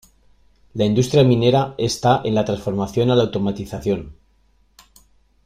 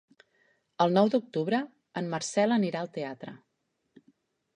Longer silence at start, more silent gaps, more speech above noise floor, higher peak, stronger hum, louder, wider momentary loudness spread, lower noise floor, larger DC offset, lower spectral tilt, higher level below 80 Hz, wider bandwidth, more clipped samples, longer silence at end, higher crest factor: about the same, 0.75 s vs 0.8 s; neither; second, 40 dB vs 50 dB; first, -4 dBFS vs -10 dBFS; neither; first, -19 LUFS vs -29 LUFS; second, 9 LU vs 14 LU; second, -58 dBFS vs -78 dBFS; neither; about the same, -6.5 dB/octave vs -5.5 dB/octave; first, -48 dBFS vs -78 dBFS; first, 15 kHz vs 10 kHz; neither; first, 1.35 s vs 1.2 s; about the same, 16 dB vs 20 dB